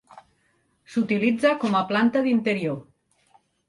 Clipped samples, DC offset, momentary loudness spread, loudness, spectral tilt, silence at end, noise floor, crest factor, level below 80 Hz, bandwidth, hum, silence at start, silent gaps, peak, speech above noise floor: under 0.1%; under 0.1%; 9 LU; -23 LUFS; -6.5 dB/octave; 0.85 s; -67 dBFS; 18 dB; -68 dBFS; 11.5 kHz; none; 0.9 s; none; -8 dBFS; 45 dB